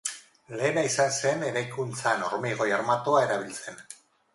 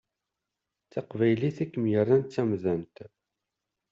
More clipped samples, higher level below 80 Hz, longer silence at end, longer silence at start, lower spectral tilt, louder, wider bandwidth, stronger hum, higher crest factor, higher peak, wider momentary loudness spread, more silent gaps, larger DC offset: neither; about the same, -72 dBFS vs -68 dBFS; second, 0.4 s vs 0.85 s; second, 0.05 s vs 0.95 s; second, -3.5 dB/octave vs -8 dB/octave; about the same, -27 LUFS vs -27 LUFS; first, 11.5 kHz vs 7.6 kHz; neither; about the same, 18 dB vs 18 dB; about the same, -10 dBFS vs -10 dBFS; first, 17 LU vs 14 LU; neither; neither